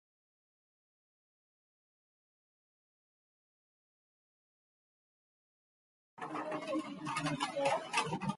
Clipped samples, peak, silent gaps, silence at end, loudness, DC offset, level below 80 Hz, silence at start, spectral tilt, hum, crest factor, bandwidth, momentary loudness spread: under 0.1%; -18 dBFS; none; 0 s; -37 LUFS; under 0.1%; -78 dBFS; 6.15 s; -4.5 dB/octave; none; 24 dB; 11.5 kHz; 8 LU